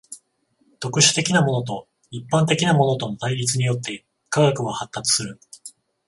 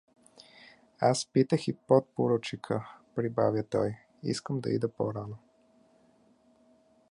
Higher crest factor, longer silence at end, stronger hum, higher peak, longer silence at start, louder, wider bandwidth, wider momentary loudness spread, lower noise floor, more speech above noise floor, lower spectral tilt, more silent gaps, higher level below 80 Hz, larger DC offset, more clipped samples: about the same, 20 dB vs 22 dB; second, 0.4 s vs 1.75 s; neither; first, -2 dBFS vs -10 dBFS; second, 0.1 s vs 1 s; first, -20 LUFS vs -30 LUFS; about the same, 11.5 kHz vs 11.5 kHz; first, 21 LU vs 11 LU; about the same, -65 dBFS vs -65 dBFS; first, 45 dB vs 35 dB; second, -4 dB/octave vs -6 dB/octave; neither; first, -60 dBFS vs -68 dBFS; neither; neither